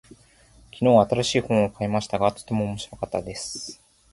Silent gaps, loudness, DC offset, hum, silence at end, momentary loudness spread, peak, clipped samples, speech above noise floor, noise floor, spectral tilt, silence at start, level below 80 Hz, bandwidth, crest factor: none; -24 LUFS; under 0.1%; none; 0.4 s; 14 LU; -4 dBFS; under 0.1%; 31 dB; -54 dBFS; -5.5 dB/octave; 0.75 s; -52 dBFS; 11.5 kHz; 20 dB